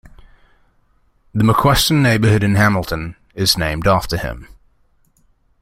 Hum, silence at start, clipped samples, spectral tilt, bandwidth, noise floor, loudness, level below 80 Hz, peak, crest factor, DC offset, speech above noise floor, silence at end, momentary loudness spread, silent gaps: none; 0.05 s; under 0.1%; -5 dB/octave; 16.5 kHz; -57 dBFS; -16 LUFS; -36 dBFS; 0 dBFS; 18 dB; under 0.1%; 42 dB; 1.15 s; 13 LU; none